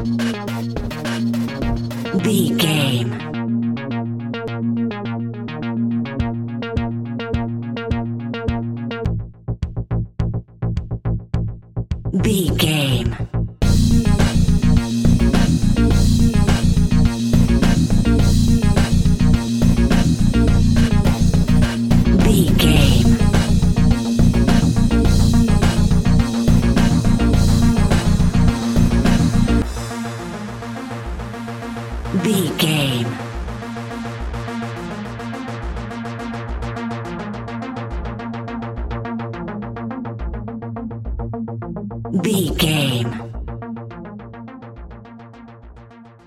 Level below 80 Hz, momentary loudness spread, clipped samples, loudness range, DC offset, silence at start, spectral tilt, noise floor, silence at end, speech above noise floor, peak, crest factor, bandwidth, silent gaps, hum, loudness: -24 dBFS; 13 LU; under 0.1%; 12 LU; under 0.1%; 0 s; -6 dB/octave; -42 dBFS; 0.2 s; 24 dB; 0 dBFS; 16 dB; 16.5 kHz; none; none; -19 LUFS